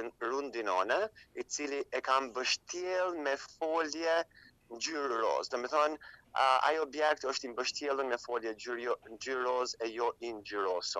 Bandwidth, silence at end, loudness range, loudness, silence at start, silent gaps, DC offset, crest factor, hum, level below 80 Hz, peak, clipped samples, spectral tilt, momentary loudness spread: 12.5 kHz; 0 s; 3 LU; -34 LUFS; 0 s; none; under 0.1%; 20 dB; none; -74 dBFS; -14 dBFS; under 0.1%; -1 dB/octave; 8 LU